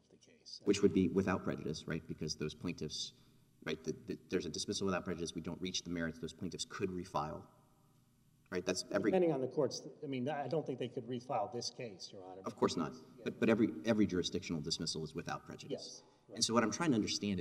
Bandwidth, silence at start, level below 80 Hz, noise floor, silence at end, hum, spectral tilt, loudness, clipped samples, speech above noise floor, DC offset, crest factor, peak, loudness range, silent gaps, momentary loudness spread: 15 kHz; 0.45 s; -68 dBFS; -70 dBFS; 0 s; none; -4.5 dB/octave; -38 LUFS; under 0.1%; 32 dB; under 0.1%; 24 dB; -14 dBFS; 5 LU; none; 13 LU